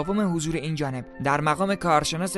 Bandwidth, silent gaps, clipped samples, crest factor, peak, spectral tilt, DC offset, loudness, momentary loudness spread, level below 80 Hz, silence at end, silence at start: 12 kHz; none; under 0.1%; 18 dB; -8 dBFS; -5 dB/octave; 0.1%; -25 LUFS; 7 LU; -48 dBFS; 0 s; 0 s